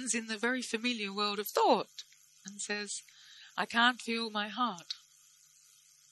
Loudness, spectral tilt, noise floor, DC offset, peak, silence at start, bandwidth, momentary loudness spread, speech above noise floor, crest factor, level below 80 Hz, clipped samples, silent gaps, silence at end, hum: -33 LUFS; -2 dB/octave; -63 dBFS; under 0.1%; -12 dBFS; 0 s; 12 kHz; 17 LU; 30 dB; 22 dB; -88 dBFS; under 0.1%; none; 1.15 s; none